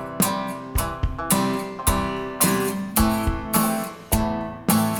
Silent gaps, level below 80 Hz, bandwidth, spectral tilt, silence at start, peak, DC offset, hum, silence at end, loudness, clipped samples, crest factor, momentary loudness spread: none; -32 dBFS; over 20 kHz; -4.5 dB/octave; 0 s; -4 dBFS; under 0.1%; none; 0 s; -23 LUFS; under 0.1%; 18 dB; 7 LU